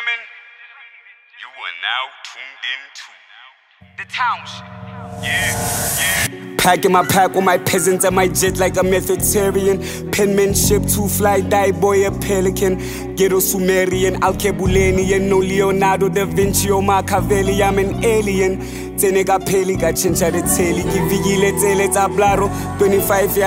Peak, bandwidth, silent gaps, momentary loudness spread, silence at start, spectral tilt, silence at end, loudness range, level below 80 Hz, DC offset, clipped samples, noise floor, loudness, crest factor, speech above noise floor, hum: 0 dBFS; 16.5 kHz; none; 11 LU; 0 s; -4 dB/octave; 0 s; 10 LU; -34 dBFS; under 0.1%; under 0.1%; -45 dBFS; -16 LUFS; 16 dB; 29 dB; none